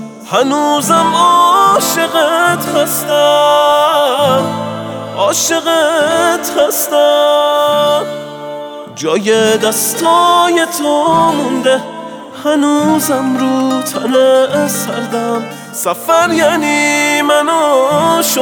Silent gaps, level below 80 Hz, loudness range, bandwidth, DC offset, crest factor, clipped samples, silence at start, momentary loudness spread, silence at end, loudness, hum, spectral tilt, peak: none; -60 dBFS; 3 LU; over 20 kHz; under 0.1%; 12 dB; under 0.1%; 0 s; 10 LU; 0 s; -11 LUFS; none; -3 dB/octave; 0 dBFS